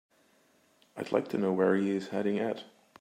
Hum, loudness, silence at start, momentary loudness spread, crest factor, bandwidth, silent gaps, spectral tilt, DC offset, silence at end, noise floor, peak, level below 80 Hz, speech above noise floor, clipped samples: none; -30 LUFS; 0.95 s; 14 LU; 18 dB; 13.5 kHz; none; -7 dB/octave; under 0.1%; 0.35 s; -67 dBFS; -14 dBFS; -80 dBFS; 37 dB; under 0.1%